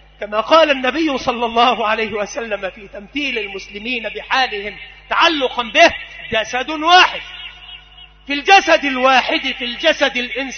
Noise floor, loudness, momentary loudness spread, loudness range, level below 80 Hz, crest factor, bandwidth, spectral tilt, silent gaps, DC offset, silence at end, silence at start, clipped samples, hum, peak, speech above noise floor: -42 dBFS; -15 LUFS; 16 LU; 5 LU; -46 dBFS; 16 dB; 6.6 kHz; -2 dB/octave; none; under 0.1%; 0 s; 0.2 s; under 0.1%; none; 0 dBFS; 26 dB